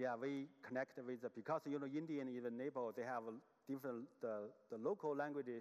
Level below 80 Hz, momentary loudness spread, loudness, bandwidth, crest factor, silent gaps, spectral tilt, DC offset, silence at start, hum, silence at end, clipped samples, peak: under -90 dBFS; 6 LU; -47 LUFS; 13.5 kHz; 16 dB; none; -7 dB/octave; under 0.1%; 0 s; none; 0 s; under 0.1%; -30 dBFS